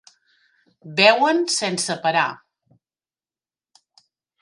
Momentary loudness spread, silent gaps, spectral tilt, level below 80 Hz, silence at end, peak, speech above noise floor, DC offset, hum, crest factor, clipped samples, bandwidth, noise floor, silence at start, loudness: 10 LU; none; -2.5 dB/octave; -76 dBFS; 2.05 s; 0 dBFS; over 71 dB; under 0.1%; none; 22 dB; under 0.1%; 11.5 kHz; under -90 dBFS; 0.85 s; -19 LUFS